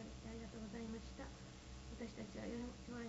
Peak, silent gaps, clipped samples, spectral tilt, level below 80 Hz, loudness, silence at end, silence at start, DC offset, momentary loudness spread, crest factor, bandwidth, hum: -36 dBFS; none; under 0.1%; -5.5 dB/octave; -58 dBFS; -51 LUFS; 0 s; 0 s; under 0.1%; 7 LU; 14 dB; 7.6 kHz; none